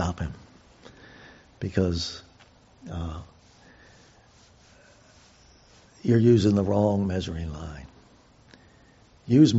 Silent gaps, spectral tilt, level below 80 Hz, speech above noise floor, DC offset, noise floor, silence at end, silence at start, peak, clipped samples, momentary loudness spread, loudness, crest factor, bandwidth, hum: none; -7.5 dB/octave; -48 dBFS; 34 dB; under 0.1%; -56 dBFS; 0 s; 0 s; -6 dBFS; under 0.1%; 28 LU; -25 LUFS; 22 dB; 8 kHz; none